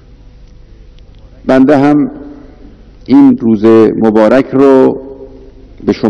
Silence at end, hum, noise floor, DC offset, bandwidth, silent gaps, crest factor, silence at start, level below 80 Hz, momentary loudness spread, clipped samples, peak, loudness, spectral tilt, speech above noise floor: 0 s; 50 Hz at -40 dBFS; -36 dBFS; under 0.1%; 7 kHz; none; 10 dB; 1.45 s; -38 dBFS; 14 LU; 4%; 0 dBFS; -8 LUFS; -8.5 dB/octave; 29 dB